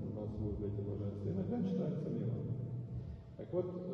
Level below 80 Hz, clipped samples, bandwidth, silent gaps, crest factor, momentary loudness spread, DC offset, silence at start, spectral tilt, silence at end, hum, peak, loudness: -56 dBFS; under 0.1%; 6.2 kHz; none; 16 dB; 8 LU; under 0.1%; 0 s; -11 dB/octave; 0 s; none; -24 dBFS; -40 LUFS